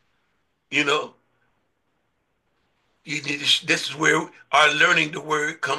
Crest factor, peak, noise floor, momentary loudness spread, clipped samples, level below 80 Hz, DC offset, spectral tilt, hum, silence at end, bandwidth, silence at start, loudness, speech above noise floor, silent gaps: 20 dB; -4 dBFS; -72 dBFS; 10 LU; under 0.1%; -74 dBFS; under 0.1%; -2 dB/octave; none; 0 s; 12.5 kHz; 0.7 s; -20 LUFS; 51 dB; none